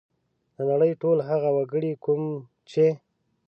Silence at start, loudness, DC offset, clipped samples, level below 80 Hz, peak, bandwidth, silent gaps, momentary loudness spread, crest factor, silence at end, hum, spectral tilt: 0.6 s; -25 LUFS; under 0.1%; under 0.1%; -78 dBFS; -12 dBFS; 6.8 kHz; none; 9 LU; 14 dB; 0.5 s; none; -9 dB/octave